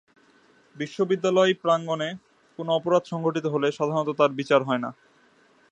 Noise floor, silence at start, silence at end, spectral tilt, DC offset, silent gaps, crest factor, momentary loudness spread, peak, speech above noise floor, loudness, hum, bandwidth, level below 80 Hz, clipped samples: -60 dBFS; 0.75 s; 0.8 s; -6 dB/octave; under 0.1%; none; 20 dB; 13 LU; -6 dBFS; 36 dB; -24 LUFS; none; 9 kHz; -76 dBFS; under 0.1%